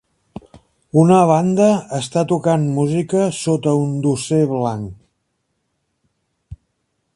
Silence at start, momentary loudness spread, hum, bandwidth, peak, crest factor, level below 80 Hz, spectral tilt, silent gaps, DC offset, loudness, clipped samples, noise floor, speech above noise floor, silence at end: 0.55 s; 9 LU; none; 11.5 kHz; 0 dBFS; 18 dB; -52 dBFS; -7 dB/octave; none; under 0.1%; -17 LUFS; under 0.1%; -71 dBFS; 55 dB; 0.6 s